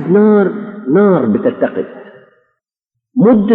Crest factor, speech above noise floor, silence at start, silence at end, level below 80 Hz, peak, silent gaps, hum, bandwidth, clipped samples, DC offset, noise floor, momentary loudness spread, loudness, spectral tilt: 12 dB; 67 dB; 0 s; 0 s; -54 dBFS; 0 dBFS; none; none; 3.9 kHz; under 0.1%; under 0.1%; -77 dBFS; 14 LU; -12 LUFS; -12 dB/octave